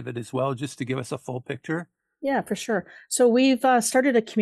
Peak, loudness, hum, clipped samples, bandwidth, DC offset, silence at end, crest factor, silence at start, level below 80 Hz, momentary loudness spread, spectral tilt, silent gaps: -8 dBFS; -24 LUFS; none; under 0.1%; 12.5 kHz; under 0.1%; 0 s; 16 dB; 0 s; -70 dBFS; 13 LU; -4.5 dB/octave; none